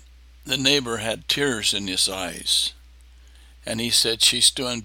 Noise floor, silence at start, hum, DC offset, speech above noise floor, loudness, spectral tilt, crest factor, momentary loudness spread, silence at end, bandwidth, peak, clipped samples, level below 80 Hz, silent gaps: -48 dBFS; 0.45 s; none; under 0.1%; 26 dB; -20 LUFS; -1.5 dB/octave; 22 dB; 11 LU; 0 s; 17 kHz; -2 dBFS; under 0.1%; -48 dBFS; none